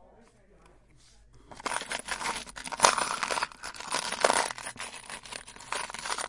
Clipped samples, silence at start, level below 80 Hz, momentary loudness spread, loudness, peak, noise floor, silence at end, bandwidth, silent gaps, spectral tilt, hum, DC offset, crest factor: under 0.1%; 0 s; -60 dBFS; 16 LU; -30 LUFS; 0 dBFS; -58 dBFS; 0 s; 11.5 kHz; none; -0.5 dB/octave; none; under 0.1%; 32 dB